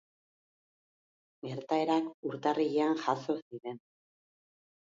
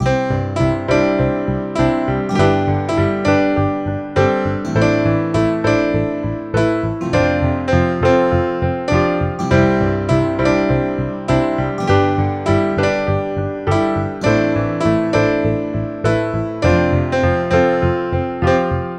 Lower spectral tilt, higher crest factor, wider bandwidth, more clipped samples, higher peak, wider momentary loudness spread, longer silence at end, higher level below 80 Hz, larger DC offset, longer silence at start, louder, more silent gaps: second, -6 dB/octave vs -7.5 dB/octave; about the same, 20 dB vs 16 dB; second, 7.6 kHz vs 9.8 kHz; neither; second, -14 dBFS vs 0 dBFS; first, 14 LU vs 5 LU; first, 1.05 s vs 0 s; second, -84 dBFS vs -34 dBFS; neither; first, 1.45 s vs 0 s; second, -32 LUFS vs -17 LUFS; first, 2.14-2.23 s, 3.42-3.51 s vs none